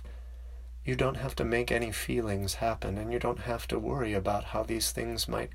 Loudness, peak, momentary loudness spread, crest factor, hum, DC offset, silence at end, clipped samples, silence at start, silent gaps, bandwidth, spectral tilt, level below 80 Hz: -32 LUFS; -14 dBFS; 10 LU; 18 dB; none; under 0.1%; 0 s; under 0.1%; 0 s; none; 16 kHz; -4.5 dB/octave; -42 dBFS